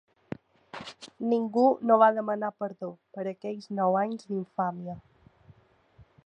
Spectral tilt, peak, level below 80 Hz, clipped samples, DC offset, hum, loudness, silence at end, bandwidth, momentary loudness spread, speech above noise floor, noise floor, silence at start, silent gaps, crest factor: -7.5 dB/octave; -8 dBFS; -70 dBFS; under 0.1%; under 0.1%; none; -27 LUFS; 0.25 s; 9.6 kHz; 22 LU; 33 dB; -61 dBFS; 0.75 s; none; 22 dB